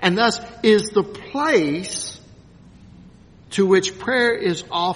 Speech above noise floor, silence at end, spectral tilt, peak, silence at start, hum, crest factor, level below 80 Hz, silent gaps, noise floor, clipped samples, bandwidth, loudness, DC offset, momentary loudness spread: 27 dB; 0 s; -4 dB/octave; 0 dBFS; 0 s; none; 20 dB; -54 dBFS; none; -46 dBFS; under 0.1%; 11 kHz; -20 LUFS; under 0.1%; 10 LU